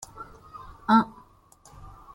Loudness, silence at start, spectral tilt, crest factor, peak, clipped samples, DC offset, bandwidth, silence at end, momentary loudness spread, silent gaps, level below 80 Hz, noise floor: -24 LUFS; 0.2 s; -5.5 dB/octave; 22 dB; -8 dBFS; under 0.1%; under 0.1%; 12 kHz; 1.05 s; 24 LU; none; -54 dBFS; -56 dBFS